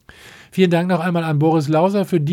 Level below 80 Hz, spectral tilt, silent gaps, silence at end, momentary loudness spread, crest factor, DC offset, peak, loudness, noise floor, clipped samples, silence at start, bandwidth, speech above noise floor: -60 dBFS; -7.5 dB/octave; none; 0 s; 3 LU; 14 dB; under 0.1%; -2 dBFS; -17 LUFS; -43 dBFS; under 0.1%; 0.25 s; 15.5 kHz; 27 dB